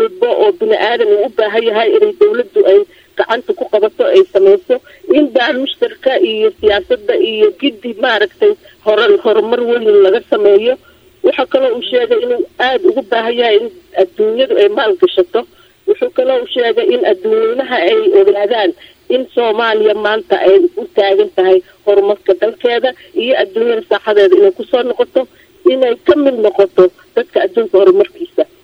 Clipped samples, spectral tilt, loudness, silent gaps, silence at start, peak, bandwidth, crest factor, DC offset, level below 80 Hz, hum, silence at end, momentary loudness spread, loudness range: 0.2%; -5.5 dB/octave; -12 LUFS; none; 0 s; 0 dBFS; 5.8 kHz; 12 dB; under 0.1%; -54 dBFS; none; 0.2 s; 7 LU; 2 LU